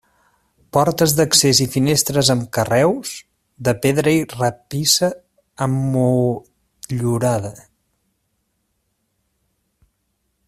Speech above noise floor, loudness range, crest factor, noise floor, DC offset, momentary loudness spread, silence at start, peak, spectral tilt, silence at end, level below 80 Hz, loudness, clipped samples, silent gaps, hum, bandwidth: 53 dB; 10 LU; 20 dB; -70 dBFS; under 0.1%; 13 LU; 0.75 s; 0 dBFS; -4 dB/octave; 2.9 s; -52 dBFS; -17 LUFS; under 0.1%; none; none; 16 kHz